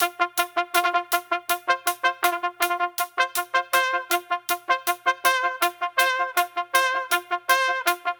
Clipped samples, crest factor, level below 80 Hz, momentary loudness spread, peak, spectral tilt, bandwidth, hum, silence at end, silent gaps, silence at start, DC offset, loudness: under 0.1%; 22 dB; -72 dBFS; 4 LU; -2 dBFS; 1 dB/octave; 19 kHz; none; 0.05 s; none; 0 s; under 0.1%; -23 LUFS